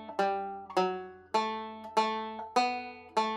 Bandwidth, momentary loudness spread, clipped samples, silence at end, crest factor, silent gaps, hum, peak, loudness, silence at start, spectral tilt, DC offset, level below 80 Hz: 15.5 kHz; 7 LU; under 0.1%; 0 s; 18 dB; none; none; -14 dBFS; -33 LUFS; 0 s; -4 dB/octave; under 0.1%; -78 dBFS